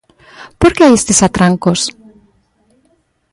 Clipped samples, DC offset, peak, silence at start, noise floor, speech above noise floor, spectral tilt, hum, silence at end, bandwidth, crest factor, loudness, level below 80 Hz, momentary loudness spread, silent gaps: under 0.1%; under 0.1%; 0 dBFS; 0.4 s; -58 dBFS; 48 dB; -4.5 dB/octave; none; 1.4 s; 11.5 kHz; 14 dB; -11 LUFS; -36 dBFS; 8 LU; none